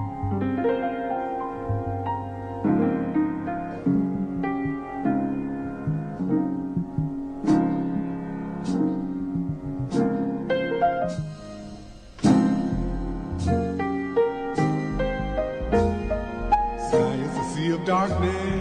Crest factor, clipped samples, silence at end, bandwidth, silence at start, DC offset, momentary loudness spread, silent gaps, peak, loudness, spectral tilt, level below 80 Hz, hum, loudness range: 16 dB; under 0.1%; 0 s; 10 kHz; 0 s; under 0.1%; 8 LU; none; -10 dBFS; -26 LUFS; -7.5 dB/octave; -40 dBFS; none; 2 LU